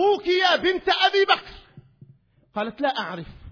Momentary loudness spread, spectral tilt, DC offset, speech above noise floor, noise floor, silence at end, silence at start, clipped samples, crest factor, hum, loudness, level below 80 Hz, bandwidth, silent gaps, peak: 14 LU; -4 dB/octave; under 0.1%; 34 dB; -57 dBFS; 0 s; 0 s; under 0.1%; 20 dB; none; -21 LUFS; -54 dBFS; 5.4 kHz; none; -4 dBFS